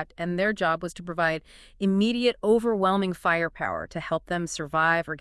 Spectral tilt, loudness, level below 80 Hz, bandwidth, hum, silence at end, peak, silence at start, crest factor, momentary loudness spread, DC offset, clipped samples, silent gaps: -5.5 dB/octave; -26 LUFS; -54 dBFS; 12 kHz; none; 0 s; -8 dBFS; 0 s; 16 dB; 8 LU; under 0.1%; under 0.1%; none